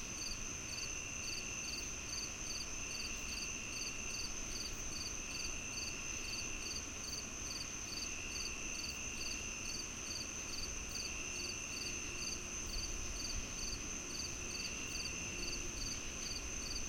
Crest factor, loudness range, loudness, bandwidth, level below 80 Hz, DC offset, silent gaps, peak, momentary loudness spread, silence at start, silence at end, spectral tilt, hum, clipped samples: 14 dB; 0 LU; -41 LUFS; 16.5 kHz; -52 dBFS; under 0.1%; none; -28 dBFS; 1 LU; 0 s; 0 s; -1 dB/octave; none; under 0.1%